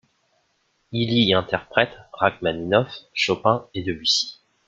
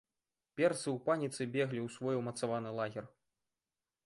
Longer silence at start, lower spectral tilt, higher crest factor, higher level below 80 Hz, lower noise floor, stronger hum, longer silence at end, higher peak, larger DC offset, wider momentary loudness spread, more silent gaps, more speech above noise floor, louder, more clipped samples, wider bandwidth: first, 0.9 s vs 0.55 s; about the same, -4.5 dB/octave vs -5.5 dB/octave; about the same, 22 dB vs 20 dB; first, -56 dBFS vs -78 dBFS; second, -68 dBFS vs under -90 dBFS; neither; second, 0.35 s vs 1 s; first, -2 dBFS vs -18 dBFS; neither; about the same, 9 LU vs 7 LU; neither; second, 46 dB vs over 54 dB; first, -22 LUFS vs -36 LUFS; neither; second, 9.2 kHz vs 11.5 kHz